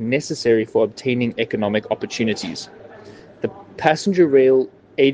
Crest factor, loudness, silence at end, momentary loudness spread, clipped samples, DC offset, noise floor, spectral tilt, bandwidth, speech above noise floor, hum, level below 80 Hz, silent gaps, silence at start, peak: 20 dB; -19 LUFS; 0 s; 14 LU; under 0.1%; under 0.1%; -42 dBFS; -5.5 dB/octave; 9.4 kHz; 23 dB; none; -62 dBFS; none; 0 s; 0 dBFS